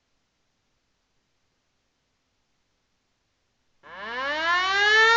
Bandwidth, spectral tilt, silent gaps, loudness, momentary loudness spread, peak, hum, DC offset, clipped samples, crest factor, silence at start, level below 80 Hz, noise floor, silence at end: 7.8 kHz; 0 dB/octave; none; -21 LUFS; 17 LU; -10 dBFS; none; under 0.1%; under 0.1%; 18 dB; 3.9 s; -62 dBFS; -73 dBFS; 0 s